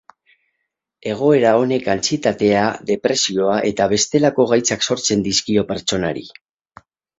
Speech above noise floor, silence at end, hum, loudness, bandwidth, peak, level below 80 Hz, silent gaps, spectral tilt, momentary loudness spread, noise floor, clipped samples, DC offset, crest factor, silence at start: 59 dB; 0.9 s; none; -17 LUFS; 8 kHz; 0 dBFS; -52 dBFS; none; -3.5 dB/octave; 6 LU; -76 dBFS; under 0.1%; under 0.1%; 18 dB; 1.05 s